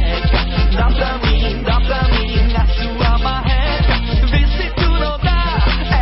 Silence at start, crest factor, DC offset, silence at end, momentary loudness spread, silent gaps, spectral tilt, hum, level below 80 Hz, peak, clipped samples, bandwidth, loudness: 0 s; 10 dB; under 0.1%; 0 s; 2 LU; none; -10 dB/octave; none; -16 dBFS; -4 dBFS; under 0.1%; 5.8 kHz; -16 LUFS